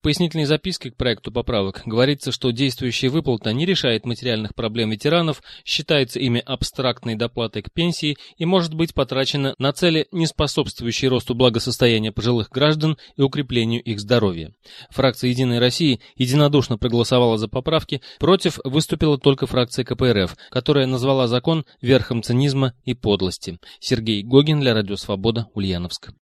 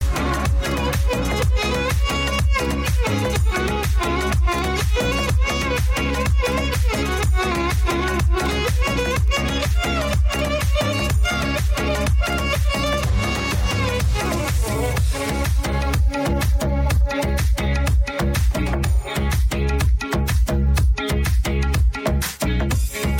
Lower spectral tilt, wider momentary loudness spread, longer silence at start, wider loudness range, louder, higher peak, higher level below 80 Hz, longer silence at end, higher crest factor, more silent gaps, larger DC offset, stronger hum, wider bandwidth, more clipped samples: about the same, -5.5 dB/octave vs -5 dB/octave; first, 7 LU vs 2 LU; about the same, 0.05 s vs 0 s; about the same, 3 LU vs 1 LU; about the same, -20 LUFS vs -21 LUFS; first, 0 dBFS vs -10 dBFS; second, -44 dBFS vs -22 dBFS; first, 0.15 s vs 0 s; first, 20 dB vs 10 dB; neither; neither; neither; second, 13.5 kHz vs 17 kHz; neither